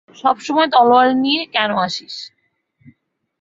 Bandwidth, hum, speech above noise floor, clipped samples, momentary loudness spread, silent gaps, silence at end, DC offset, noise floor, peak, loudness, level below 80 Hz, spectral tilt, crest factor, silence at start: 7.8 kHz; none; 47 dB; under 0.1%; 18 LU; none; 1.15 s; under 0.1%; -63 dBFS; -2 dBFS; -15 LUFS; -64 dBFS; -4 dB/octave; 16 dB; 0.25 s